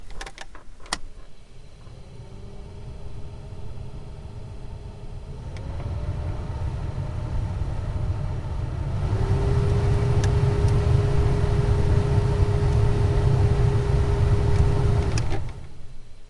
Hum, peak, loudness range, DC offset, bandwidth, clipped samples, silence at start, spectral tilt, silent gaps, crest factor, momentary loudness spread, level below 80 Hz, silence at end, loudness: none; -6 dBFS; 18 LU; under 0.1%; 11.5 kHz; under 0.1%; 0 s; -7.5 dB/octave; none; 18 dB; 19 LU; -30 dBFS; 0 s; -24 LUFS